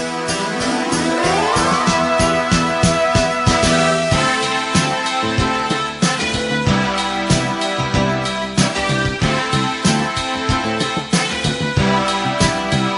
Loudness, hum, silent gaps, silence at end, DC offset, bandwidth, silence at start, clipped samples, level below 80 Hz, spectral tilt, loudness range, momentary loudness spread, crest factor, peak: -17 LUFS; none; none; 0 s; under 0.1%; 11 kHz; 0 s; under 0.1%; -34 dBFS; -4 dB/octave; 3 LU; 4 LU; 16 dB; -2 dBFS